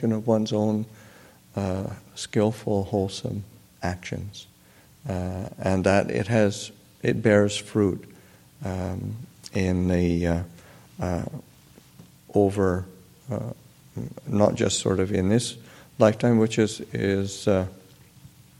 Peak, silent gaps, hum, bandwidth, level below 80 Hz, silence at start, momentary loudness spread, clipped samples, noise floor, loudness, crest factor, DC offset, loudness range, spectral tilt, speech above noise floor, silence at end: -2 dBFS; none; none; 16.5 kHz; -52 dBFS; 0 s; 16 LU; under 0.1%; -54 dBFS; -25 LUFS; 24 dB; under 0.1%; 6 LU; -6 dB/octave; 30 dB; 0.3 s